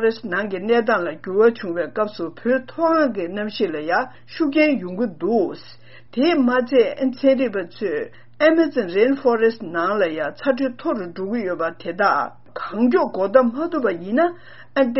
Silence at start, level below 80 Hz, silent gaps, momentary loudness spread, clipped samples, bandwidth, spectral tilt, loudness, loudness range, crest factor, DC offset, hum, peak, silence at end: 0 s; -64 dBFS; none; 9 LU; under 0.1%; 6 kHz; -3.5 dB/octave; -20 LUFS; 3 LU; 20 dB; 0.7%; none; -2 dBFS; 0 s